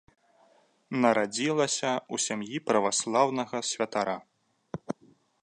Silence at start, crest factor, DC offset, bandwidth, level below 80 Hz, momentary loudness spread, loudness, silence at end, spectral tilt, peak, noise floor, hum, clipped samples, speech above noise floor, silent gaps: 0.9 s; 22 dB; under 0.1%; 11 kHz; -74 dBFS; 14 LU; -28 LUFS; 0.5 s; -3 dB/octave; -8 dBFS; -64 dBFS; none; under 0.1%; 36 dB; none